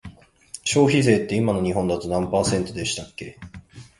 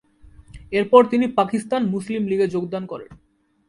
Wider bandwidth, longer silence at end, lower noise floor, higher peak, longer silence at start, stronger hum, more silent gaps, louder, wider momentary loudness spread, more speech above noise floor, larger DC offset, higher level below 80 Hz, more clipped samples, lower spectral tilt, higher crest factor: about the same, 11.5 kHz vs 11.5 kHz; second, 0.15 s vs 0.55 s; second, -44 dBFS vs -48 dBFS; second, -4 dBFS vs 0 dBFS; second, 0.05 s vs 0.55 s; neither; neither; about the same, -22 LUFS vs -20 LUFS; first, 20 LU vs 15 LU; second, 23 dB vs 28 dB; neither; first, -46 dBFS vs -52 dBFS; neither; second, -5 dB/octave vs -6.5 dB/octave; about the same, 20 dB vs 20 dB